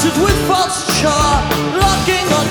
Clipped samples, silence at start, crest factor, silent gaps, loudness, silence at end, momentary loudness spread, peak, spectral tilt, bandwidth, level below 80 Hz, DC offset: under 0.1%; 0 s; 14 dB; none; -14 LUFS; 0 s; 2 LU; 0 dBFS; -4 dB/octave; over 20 kHz; -26 dBFS; under 0.1%